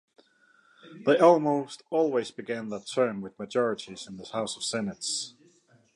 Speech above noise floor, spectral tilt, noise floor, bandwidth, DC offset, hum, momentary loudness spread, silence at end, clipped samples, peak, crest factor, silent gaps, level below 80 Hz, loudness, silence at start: 36 dB; -4 dB/octave; -63 dBFS; 11.5 kHz; under 0.1%; none; 16 LU; 0.65 s; under 0.1%; -6 dBFS; 22 dB; none; -74 dBFS; -27 LUFS; 0.85 s